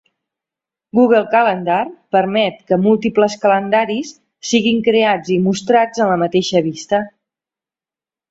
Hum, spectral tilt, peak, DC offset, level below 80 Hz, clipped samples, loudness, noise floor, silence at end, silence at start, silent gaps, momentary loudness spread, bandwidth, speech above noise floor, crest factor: none; -5 dB/octave; 0 dBFS; under 0.1%; -58 dBFS; under 0.1%; -15 LUFS; under -90 dBFS; 1.25 s; 0.95 s; none; 7 LU; 8 kHz; over 75 dB; 16 dB